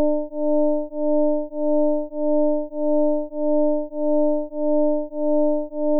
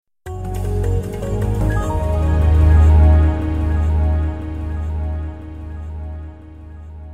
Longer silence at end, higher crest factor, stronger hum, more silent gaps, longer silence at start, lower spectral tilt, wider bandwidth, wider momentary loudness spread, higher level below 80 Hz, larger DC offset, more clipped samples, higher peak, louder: about the same, 0 s vs 0 s; second, 6 dB vs 14 dB; neither; neither; about the same, 0 s vs 0.05 s; first, -15.5 dB/octave vs -8.5 dB/octave; second, 1 kHz vs 8.6 kHz; second, 4 LU vs 21 LU; second, -62 dBFS vs -18 dBFS; second, under 0.1% vs 0.8%; neither; second, -14 dBFS vs -2 dBFS; second, -22 LUFS vs -18 LUFS